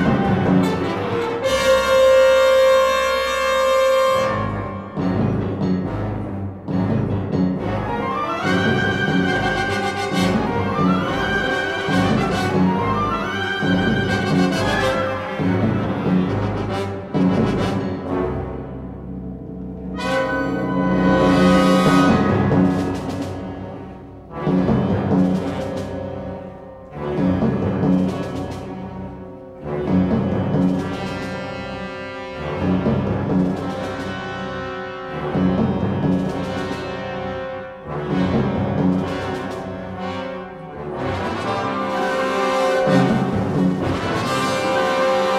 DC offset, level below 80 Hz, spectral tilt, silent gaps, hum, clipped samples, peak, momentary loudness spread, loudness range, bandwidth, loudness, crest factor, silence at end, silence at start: under 0.1%; -40 dBFS; -6.5 dB/octave; none; none; under 0.1%; -4 dBFS; 14 LU; 7 LU; 13.5 kHz; -20 LUFS; 16 dB; 0 s; 0 s